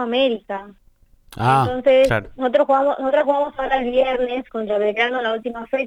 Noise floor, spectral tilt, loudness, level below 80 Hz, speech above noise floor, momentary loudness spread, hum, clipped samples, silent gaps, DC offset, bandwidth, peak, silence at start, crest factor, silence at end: -49 dBFS; -6.5 dB/octave; -19 LUFS; -46 dBFS; 30 dB; 9 LU; none; under 0.1%; none; under 0.1%; 12 kHz; -6 dBFS; 0 s; 14 dB; 0 s